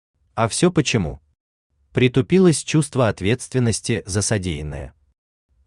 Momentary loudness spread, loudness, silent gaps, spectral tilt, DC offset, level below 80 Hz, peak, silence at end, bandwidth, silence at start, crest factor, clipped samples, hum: 13 LU; -20 LUFS; 1.40-1.70 s; -5 dB/octave; under 0.1%; -44 dBFS; -2 dBFS; 0.8 s; 12.5 kHz; 0.35 s; 18 dB; under 0.1%; none